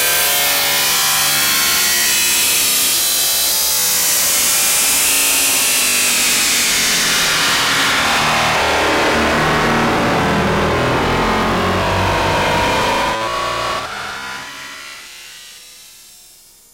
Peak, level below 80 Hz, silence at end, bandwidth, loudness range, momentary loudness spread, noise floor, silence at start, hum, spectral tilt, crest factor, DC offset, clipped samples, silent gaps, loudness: -4 dBFS; -36 dBFS; 0.85 s; 16 kHz; 8 LU; 10 LU; -44 dBFS; 0 s; none; -1.5 dB/octave; 12 dB; under 0.1%; under 0.1%; none; -13 LUFS